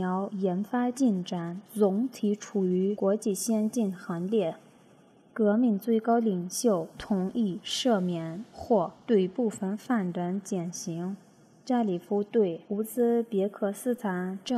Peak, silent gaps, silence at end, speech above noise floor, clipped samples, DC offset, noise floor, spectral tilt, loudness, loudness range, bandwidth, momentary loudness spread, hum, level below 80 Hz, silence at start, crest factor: -12 dBFS; none; 0 s; 30 dB; under 0.1%; under 0.1%; -58 dBFS; -6 dB/octave; -29 LUFS; 2 LU; 14.5 kHz; 8 LU; none; -68 dBFS; 0 s; 16 dB